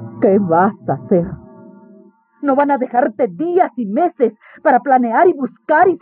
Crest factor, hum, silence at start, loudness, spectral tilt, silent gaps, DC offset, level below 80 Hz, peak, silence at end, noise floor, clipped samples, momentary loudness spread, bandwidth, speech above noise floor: 14 dB; none; 0 s; -15 LUFS; -7.5 dB/octave; none; under 0.1%; -54 dBFS; -2 dBFS; 0.05 s; -47 dBFS; under 0.1%; 7 LU; 3.8 kHz; 32 dB